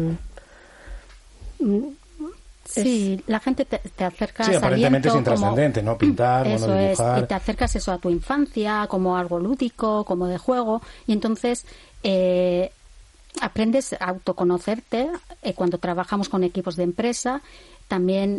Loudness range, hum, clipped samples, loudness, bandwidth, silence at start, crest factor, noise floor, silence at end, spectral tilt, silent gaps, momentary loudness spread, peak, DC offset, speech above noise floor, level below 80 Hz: 5 LU; none; under 0.1%; -23 LUFS; 11.5 kHz; 0 s; 18 dB; -49 dBFS; 0 s; -6 dB/octave; none; 11 LU; -6 dBFS; under 0.1%; 27 dB; -42 dBFS